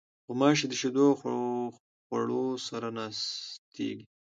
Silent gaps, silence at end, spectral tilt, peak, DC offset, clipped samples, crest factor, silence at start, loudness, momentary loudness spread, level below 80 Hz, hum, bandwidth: 1.80-2.10 s, 3.58-3.72 s; 0.3 s; -4.5 dB/octave; -10 dBFS; under 0.1%; under 0.1%; 22 dB; 0.3 s; -30 LUFS; 13 LU; -78 dBFS; none; 9 kHz